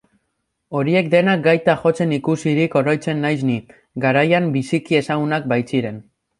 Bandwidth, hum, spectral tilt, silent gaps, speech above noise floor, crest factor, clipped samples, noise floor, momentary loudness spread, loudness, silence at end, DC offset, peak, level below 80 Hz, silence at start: 11.5 kHz; none; -7 dB/octave; none; 55 dB; 16 dB; under 0.1%; -73 dBFS; 8 LU; -18 LUFS; 0.4 s; under 0.1%; -2 dBFS; -60 dBFS; 0.7 s